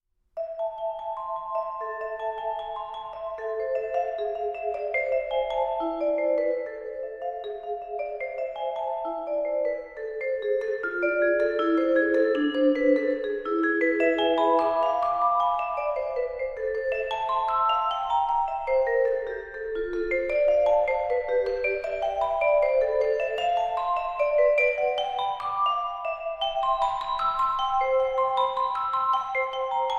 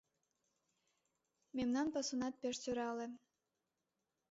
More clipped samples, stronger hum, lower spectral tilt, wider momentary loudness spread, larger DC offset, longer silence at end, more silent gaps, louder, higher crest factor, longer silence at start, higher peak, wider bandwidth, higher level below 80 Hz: neither; neither; first, -4.5 dB/octave vs -3 dB/octave; about the same, 10 LU vs 11 LU; neither; second, 0 s vs 1.15 s; neither; first, -26 LUFS vs -41 LUFS; about the same, 16 dB vs 16 dB; second, 0.35 s vs 1.55 s; first, -10 dBFS vs -28 dBFS; about the same, 7.6 kHz vs 7.6 kHz; first, -54 dBFS vs -76 dBFS